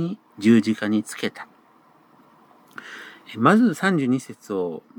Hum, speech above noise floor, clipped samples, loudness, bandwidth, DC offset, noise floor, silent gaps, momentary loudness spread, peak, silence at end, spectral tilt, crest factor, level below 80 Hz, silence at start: none; 35 dB; under 0.1%; -21 LUFS; 17 kHz; under 0.1%; -56 dBFS; none; 23 LU; -2 dBFS; 0.2 s; -6 dB/octave; 20 dB; -76 dBFS; 0 s